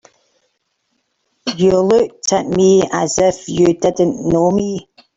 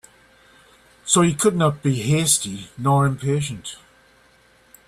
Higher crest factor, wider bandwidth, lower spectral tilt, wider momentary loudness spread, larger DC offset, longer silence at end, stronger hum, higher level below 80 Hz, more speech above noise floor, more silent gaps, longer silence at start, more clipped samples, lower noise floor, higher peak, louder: second, 14 dB vs 20 dB; second, 7.8 kHz vs 14.5 kHz; about the same, -5 dB/octave vs -4.5 dB/octave; second, 9 LU vs 14 LU; neither; second, 0.35 s vs 1.15 s; neither; first, -46 dBFS vs -54 dBFS; first, 54 dB vs 35 dB; neither; first, 1.45 s vs 1.05 s; neither; first, -68 dBFS vs -55 dBFS; about the same, -2 dBFS vs -2 dBFS; first, -15 LUFS vs -20 LUFS